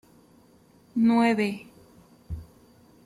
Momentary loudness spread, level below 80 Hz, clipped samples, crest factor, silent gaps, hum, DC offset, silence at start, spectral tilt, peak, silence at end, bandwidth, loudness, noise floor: 20 LU; -52 dBFS; under 0.1%; 18 dB; none; none; under 0.1%; 0.95 s; -6.5 dB/octave; -10 dBFS; 0.6 s; 12 kHz; -24 LUFS; -58 dBFS